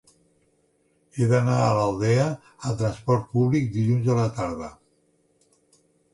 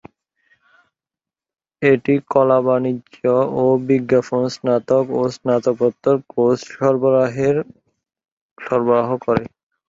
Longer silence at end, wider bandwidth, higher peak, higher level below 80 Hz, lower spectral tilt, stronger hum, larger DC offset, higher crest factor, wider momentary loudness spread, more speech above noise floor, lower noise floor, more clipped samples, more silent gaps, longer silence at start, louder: first, 1.4 s vs 0.4 s; first, 11.5 kHz vs 7.8 kHz; second, -8 dBFS vs -2 dBFS; about the same, -54 dBFS vs -58 dBFS; about the same, -7.5 dB/octave vs -7.5 dB/octave; neither; neither; about the same, 16 dB vs 16 dB; first, 10 LU vs 7 LU; second, 44 dB vs 72 dB; second, -66 dBFS vs -89 dBFS; neither; second, none vs 8.32-8.56 s; second, 1.15 s vs 1.8 s; second, -23 LUFS vs -18 LUFS